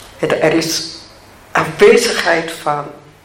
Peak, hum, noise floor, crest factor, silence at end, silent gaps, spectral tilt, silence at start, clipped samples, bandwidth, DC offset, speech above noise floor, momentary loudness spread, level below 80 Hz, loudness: 0 dBFS; none; -41 dBFS; 16 dB; 0.25 s; none; -3.5 dB/octave; 0 s; under 0.1%; 16.5 kHz; under 0.1%; 27 dB; 15 LU; -48 dBFS; -14 LUFS